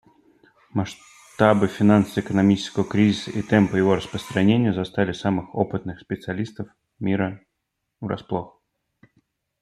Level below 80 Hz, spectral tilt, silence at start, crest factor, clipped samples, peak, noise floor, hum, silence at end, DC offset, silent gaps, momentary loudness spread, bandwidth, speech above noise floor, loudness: -56 dBFS; -7 dB/octave; 0.75 s; 20 dB; under 0.1%; -2 dBFS; -78 dBFS; none; 1.15 s; under 0.1%; none; 14 LU; 12 kHz; 57 dB; -22 LUFS